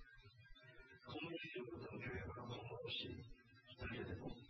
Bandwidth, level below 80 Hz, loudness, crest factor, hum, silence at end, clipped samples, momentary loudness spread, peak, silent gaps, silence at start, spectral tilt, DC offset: 6.4 kHz; -68 dBFS; -50 LUFS; 18 dB; none; 0 s; under 0.1%; 17 LU; -34 dBFS; none; 0 s; -3.5 dB/octave; under 0.1%